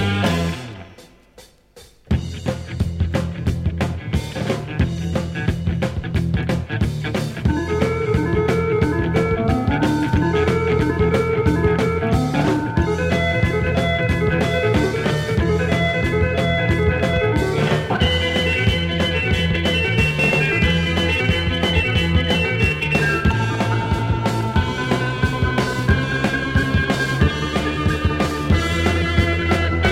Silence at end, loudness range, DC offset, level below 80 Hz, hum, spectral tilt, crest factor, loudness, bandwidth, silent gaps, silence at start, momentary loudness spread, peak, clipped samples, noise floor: 0 s; 5 LU; under 0.1%; -30 dBFS; none; -6 dB/octave; 16 dB; -19 LUFS; 15 kHz; none; 0 s; 5 LU; -4 dBFS; under 0.1%; -48 dBFS